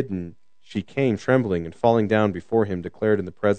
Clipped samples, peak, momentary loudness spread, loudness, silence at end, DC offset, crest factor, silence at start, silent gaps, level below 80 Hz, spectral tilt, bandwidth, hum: under 0.1%; -4 dBFS; 12 LU; -23 LUFS; 0 s; 0.4%; 20 dB; 0 s; none; -60 dBFS; -8 dB/octave; 9 kHz; none